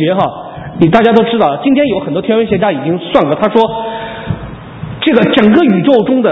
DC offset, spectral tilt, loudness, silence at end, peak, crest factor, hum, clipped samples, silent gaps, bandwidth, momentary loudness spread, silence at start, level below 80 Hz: under 0.1%; -8.5 dB/octave; -11 LUFS; 0 s; 0 dBFS; 10 dB; none; 0.4%; none; 5.8 kHz; 14 LU; 0 s; -40 dBFS